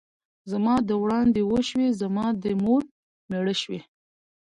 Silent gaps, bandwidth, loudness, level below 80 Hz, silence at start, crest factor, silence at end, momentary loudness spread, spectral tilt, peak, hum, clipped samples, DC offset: 2.91-3.29 s; 10.5 kHz; -25 LUFS; -56 dBFS; 0.45 s; 14 dB; 0.6 s; 11 LU; -6 dB/octave; -12 dBFS; none; under 0.1%; under 0.1%